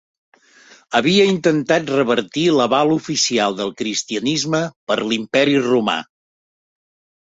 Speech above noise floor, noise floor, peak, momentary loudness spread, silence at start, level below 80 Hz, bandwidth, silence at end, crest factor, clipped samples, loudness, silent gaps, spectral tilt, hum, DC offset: 31 dB; -49 dBFS; 0 dBFS; 7 LU; 0.9 s; -60 dBFS; 8 kHz; 1.2 s; 18 dB; under 0.1%; -17 LUFS; 4.76-4.87 s; -4 dB/octave; none; under 0.1%